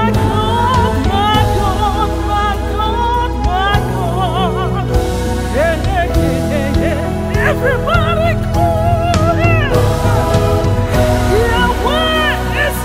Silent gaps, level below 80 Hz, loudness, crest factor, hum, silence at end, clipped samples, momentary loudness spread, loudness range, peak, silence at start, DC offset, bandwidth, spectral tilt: none; -20 dBFS; -14 LUFS; 12 dB; none; 0 s; under 0.1%; 4 LU; 2 LU; 0 dBFS; 0 s; under 0.1%; 16 kHz; -6 dB/octave